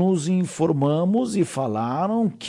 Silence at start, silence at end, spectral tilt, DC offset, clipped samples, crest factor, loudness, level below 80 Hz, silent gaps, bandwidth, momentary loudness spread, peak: 0 s; 0 s; -7 dB/octave; under 0.1%; under 0.1%; 12 dB; -22 LUFS; -64 dBFS; none; 11.5 kHz; 4 LU; -10 dBFS